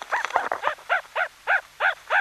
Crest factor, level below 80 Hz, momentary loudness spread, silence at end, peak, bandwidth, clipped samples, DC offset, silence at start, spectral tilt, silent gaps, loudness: 22 dB; -68 dBFS; 6 LU; 0 s; -4 dBFS; 13.5 kHz; under 0.1%; under 0.1%; 0 s; -0.5 dB/octave; none; -25 LUFS